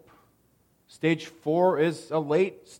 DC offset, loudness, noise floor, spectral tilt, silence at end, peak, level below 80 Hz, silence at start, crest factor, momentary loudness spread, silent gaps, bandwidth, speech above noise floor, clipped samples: under 0.1%; -26 LUFS; -66 dBFS; -6.5 dB/octave; 0.05 s; -10 dBFS; -74 dBFS; 1.05 s; 18 dB; 7 LU; none; 16.5 kHz; 40 dB; under 0.1%